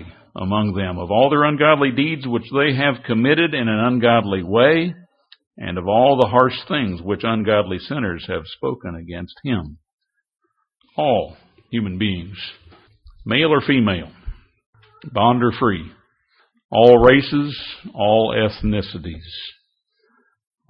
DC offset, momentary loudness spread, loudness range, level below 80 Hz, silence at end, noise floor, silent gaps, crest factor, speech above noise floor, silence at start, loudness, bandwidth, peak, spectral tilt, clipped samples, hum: under 0.1%; 17 LU; 9 LU; -44 dBFS; 1.2 s; -67 dBFS; 5.47-5.51 s, 9.93-9.98 s, 14.66-14.73 s, 16.65-16.69 s; 20 dB; 49 dB; 0 s; -18 LUFS; 5.6 kHz; 0 dBFS; -9 dB/octave; under 0.1%; none